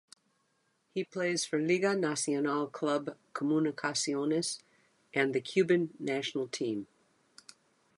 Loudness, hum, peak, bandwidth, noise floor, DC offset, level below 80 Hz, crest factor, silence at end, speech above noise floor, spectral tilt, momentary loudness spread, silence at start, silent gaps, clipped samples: -32 LUFS; none; -14 dBFS; 11.5 kHz; -75 dBFS; under 0.1%; -82 dBFS; 18 dB; 1.15 s; 44 dB; -4 dB/octave; 9 LU; 0.95 s; none; under 0.1%